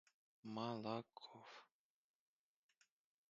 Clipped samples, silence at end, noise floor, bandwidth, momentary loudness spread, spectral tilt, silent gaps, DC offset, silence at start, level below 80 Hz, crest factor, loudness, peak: under 0.1%; 1.65 s; -79 dBFS; 7.4 kHz; 15 LU; -5 dB/octave; none; under 0.1%; 0.45 s; under -90 dBFS; 24 dB; -50 LUFS; -30 dBFS